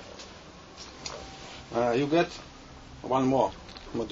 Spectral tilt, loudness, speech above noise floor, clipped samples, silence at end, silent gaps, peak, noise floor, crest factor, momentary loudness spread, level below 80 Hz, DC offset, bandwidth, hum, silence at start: -5.5 dB/octave; -29 LUFS; 22 dB; under 0.1%; 0 s; none; -10 dBFS; -48 dBFS; 20 dB; 22 LU; -54 dBFS; under 0.1%; 8 kHz; none; 0 s